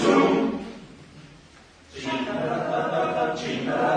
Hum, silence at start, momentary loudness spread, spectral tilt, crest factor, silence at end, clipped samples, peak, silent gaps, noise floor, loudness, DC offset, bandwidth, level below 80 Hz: none; 0 s; 23 LU; -5.5 dB/octave; 20 dB; 0 s; under 0.1%; -4 dBFS; none; -51 dBFS; -25 LUFS; under 0.1%; 10 kHz; -58 dBFS